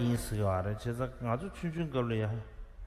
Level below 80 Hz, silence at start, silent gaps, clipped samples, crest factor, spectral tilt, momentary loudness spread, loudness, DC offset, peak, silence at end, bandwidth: -48 dBFS; 0 s; none; under 0.1%; 16 dB; -7 dB/octave; 5 LU; -35 LUFS; under 0.1%; -18 dBFS; 0 s; 15 kHz